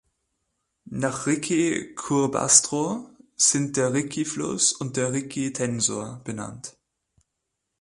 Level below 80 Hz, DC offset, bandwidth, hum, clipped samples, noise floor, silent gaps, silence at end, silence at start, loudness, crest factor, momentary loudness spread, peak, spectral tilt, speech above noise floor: -62 dBFS; under 0.1%; 11.5 kHz; none; under 0.1%; -81 dBFS; none; 1.1 s; 0.85 s; -23 LUFS; 26 dB; 17 LU; 0 dBFS; -3 dB/octave; 56 dB